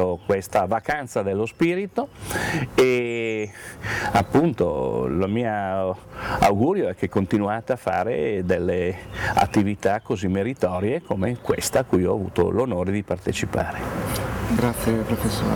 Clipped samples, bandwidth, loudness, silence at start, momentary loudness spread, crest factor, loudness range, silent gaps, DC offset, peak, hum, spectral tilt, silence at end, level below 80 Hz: under 0.1%; over 20 kHz; -23 LUFS; 0 s; 7 LU; 16 dB; 1 LU; none; under 0.1%; -8 dBFS; none; -6 dB/octave; 0 s; -44 dBFS